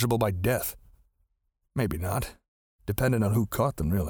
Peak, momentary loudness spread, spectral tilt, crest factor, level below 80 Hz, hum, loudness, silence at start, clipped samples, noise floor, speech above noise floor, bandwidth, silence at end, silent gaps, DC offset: -10 dBFS; 10 LU; -6.5 dB/octave; 18 dB; -44 dBFS; none; -28 LUFS; 0 s; under 0.1%; -76 dBFS; 50 dB; over 20 kHz; 0 s; 2.48-2.79 s; under 0.1%